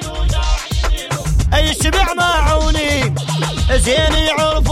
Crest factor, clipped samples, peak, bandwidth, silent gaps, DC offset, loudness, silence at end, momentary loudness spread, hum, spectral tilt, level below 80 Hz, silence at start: 12 dB; under 0.1%; -2 dBFS; 16 kHz; none; under 0.1%; -15 LUFS; 0 s; 6 LU; none; -4 dB/octave; -18 dBFS; 0 s